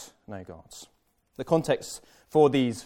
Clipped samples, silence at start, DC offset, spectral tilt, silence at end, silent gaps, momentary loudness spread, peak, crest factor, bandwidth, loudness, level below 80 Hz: under 0.1%; 0 s; under 0.1%; -6 dB/octave; 0 s; none; 23 LU; -8 dBFS; 20 dB; 16.5 kHz; -25 LUFS; -62 dBFS